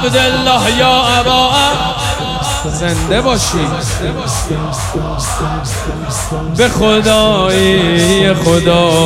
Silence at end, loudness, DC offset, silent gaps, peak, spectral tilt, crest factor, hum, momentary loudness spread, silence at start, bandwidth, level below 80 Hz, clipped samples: 0 s; -12 LUFS; under 0.1%; none; 0 dBFS; -4 dB/octave; 12 dB; none; 9 LU; 0 s; 16.5 kHz; -26 dBFS; under 0.1%